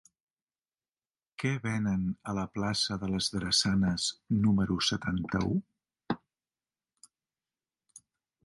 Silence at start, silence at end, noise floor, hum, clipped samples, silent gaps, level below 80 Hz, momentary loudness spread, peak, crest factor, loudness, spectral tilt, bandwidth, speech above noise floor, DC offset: 1.4 s; 2.3 s; under -90 dBFS; none; under 0.1%; none; -54 dBFS; 9 LU; -14 dBFS; 18 dB; -30 LUFS; -4.5 dB/octave; 11.5 kHz; over 60 dB; under 0.1%